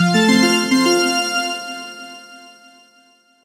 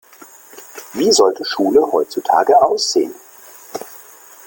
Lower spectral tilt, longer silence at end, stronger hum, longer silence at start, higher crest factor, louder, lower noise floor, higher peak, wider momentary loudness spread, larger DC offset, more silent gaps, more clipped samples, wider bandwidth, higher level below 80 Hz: first, -4 dB/octave vs -2.5 dB/octave; first, 1 s vs 0.5 s; neither; second, 0 s vs 0.55 s; about the same, 16 dB vs 16 dB; about the same, -15 LUFS vs -15 LUFS; first, -54 dBFS vs -42 dBFS; about the same, -2 dBFS vs 0 dBFS; about the same, 21 LU vs 22 LU; neither; neither; neither; about the same, 16 kHz vs 17 kHz; second, -74 dBFS vs -60 dBFS